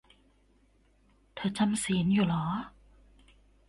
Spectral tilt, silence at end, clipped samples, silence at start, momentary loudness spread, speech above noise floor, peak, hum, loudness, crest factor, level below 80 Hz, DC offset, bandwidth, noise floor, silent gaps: -5.5 dB/octave; 1 s; under 0.1%; 1.35 s; 15 LU; 37 dB; -16 dBFS; none; -30 LUFS; 16 dB; -58 dBFS; under 0.1%; 11.5 kHz; -65 dBFS; none